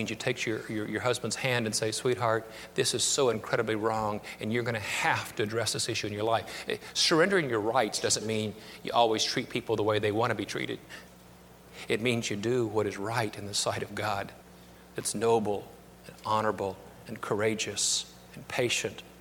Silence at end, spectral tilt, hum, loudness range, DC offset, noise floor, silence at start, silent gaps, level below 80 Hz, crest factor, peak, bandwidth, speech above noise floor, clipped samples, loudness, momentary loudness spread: 0 s; -3.5 dB/octave; none; 4 LU; under 0.1%; -53 dBFS; 0 s; none; -62 dBFS; 20 dB; -10 dBFS; 19 kHz; 23 dB; under 0.1%; -29 LUFS; 12 LU